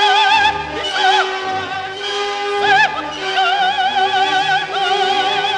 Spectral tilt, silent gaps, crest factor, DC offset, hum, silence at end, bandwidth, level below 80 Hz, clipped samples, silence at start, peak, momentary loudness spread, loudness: -1.5 dB/octave; none; 16 dB; under 0.1%; none; 0 s; 10.5 kHz; -50 dBFS; under 0.1%; 0 s; 0 dBFS; 9 LU; -15 LUFS